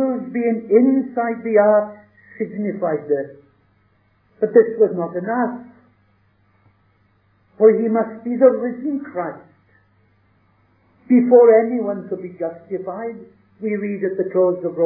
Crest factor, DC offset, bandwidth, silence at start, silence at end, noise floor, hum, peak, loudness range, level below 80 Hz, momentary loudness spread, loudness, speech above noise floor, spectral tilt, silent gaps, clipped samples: 18 dB; under 0.1%; 2.7 kHz; 0 s; 0 s; -60 dBFS; 50 Hz at -55 dBFS; 0 dBFS; 4 LU; -72 dBFS; 15 LU; -18 LUFS; 42 dB; -13.5 dB/octave; none; under 0.1%